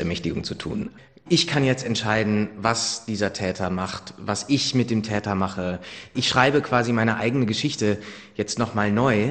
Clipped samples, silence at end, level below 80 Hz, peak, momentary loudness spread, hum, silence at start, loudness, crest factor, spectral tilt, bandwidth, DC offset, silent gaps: under 0.1%; 0 s; -54 dBFS; -2 dBFS; 11 LU; none; 0 s; -23 LUFS; 22 dB; -4.5 dB/octave; 9.4 kHz; under 0.1%; none